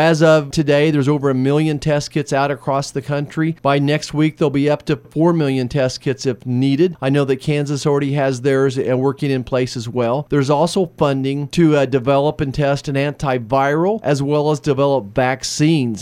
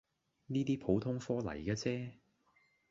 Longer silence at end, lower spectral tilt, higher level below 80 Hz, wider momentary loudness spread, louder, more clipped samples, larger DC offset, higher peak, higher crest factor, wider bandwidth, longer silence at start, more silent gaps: second, 0 s vs 0.75 s; about the same, -6.5 dB/octave vs -7 dB/octave; first, -46 dBFS vs -62 dBFS; about the same, 6 LU vs 6 LU; first, -17 LUFS vs -37 LUFS; neither; neither; first, -2 dBFS vs -20 dBFS; about the same, 16 dB vs 20 dB; first, 13.5 kHz vs 7.6 kHz; second, 0 s vs 0.5 s; neither